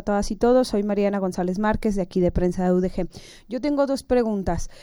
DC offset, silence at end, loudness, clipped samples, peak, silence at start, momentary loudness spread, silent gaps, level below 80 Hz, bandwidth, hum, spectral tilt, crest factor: under 0.1%; 0 s; -23 LUFS; under 0.1%; -8 dBFS; 0 s; 8 LU; none; -36 dBFS; 16.5 kHz; none; -7 dB/octave; 14 dB